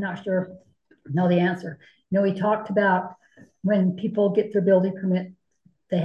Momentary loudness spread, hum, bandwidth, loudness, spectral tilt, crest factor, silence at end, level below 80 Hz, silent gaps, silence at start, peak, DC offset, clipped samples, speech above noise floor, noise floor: 11 LU; none; 5.6 kHz; -23 LUFS; -9 dB/octave; 16 dB; 0 s; -70 dBFS; none; 0 s; -8 dBFS; under 0.1%; under 0.1%; 41 dB; -64 dBFS